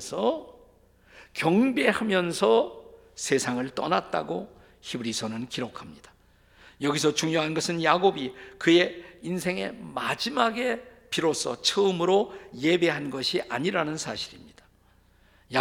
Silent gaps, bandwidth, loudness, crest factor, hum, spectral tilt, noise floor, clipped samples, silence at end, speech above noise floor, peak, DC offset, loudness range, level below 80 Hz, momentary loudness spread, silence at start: none; 16.5 kHz; -26 LUFS; 22 dB; none; -4 dB/octave; -61 dBFS; under 0.1%; 0 s; 34 dB; -4 dBFS; under 0.1%; 5 LU; -62 dBFS; 13 LU; 0 s